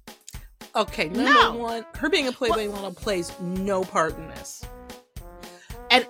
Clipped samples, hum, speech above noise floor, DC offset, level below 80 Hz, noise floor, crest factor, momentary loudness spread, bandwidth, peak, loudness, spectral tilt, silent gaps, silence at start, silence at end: under 0.1%; none; 19 dB; under 0.1%; -46 dBFS; -43 dBFS; 26 dB; 25 LU; 16.5 kHz; 0 dBFS; -24 LUFS; -3.5 dB/octave; none; 0.05 s; 0 s